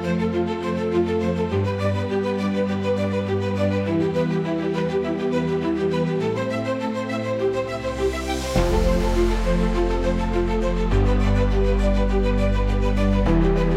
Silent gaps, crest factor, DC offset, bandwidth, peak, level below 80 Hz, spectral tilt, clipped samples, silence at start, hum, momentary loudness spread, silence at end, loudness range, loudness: none; 14 dB; under 0.1%; 12 kHz; -8 dBFS; -26 dBFS; -7 dB/octave; under 0.1%; 0 s; none; 4 LU; 0 s; 2 LU; -22 LUFS